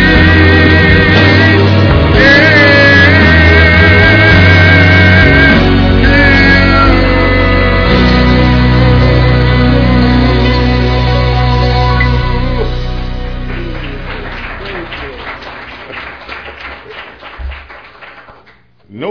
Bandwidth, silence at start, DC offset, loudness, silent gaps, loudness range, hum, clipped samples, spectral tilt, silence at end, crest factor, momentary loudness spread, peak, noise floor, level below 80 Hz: 5.4 kHz; 0 s; under 0.1%; -6 LUFS; none; 19 LU; none; 1%; -7 dB/octave; 0 s; 8 dB; 20 LU; 0 dBFS; -44 dBFS; -16 dBFS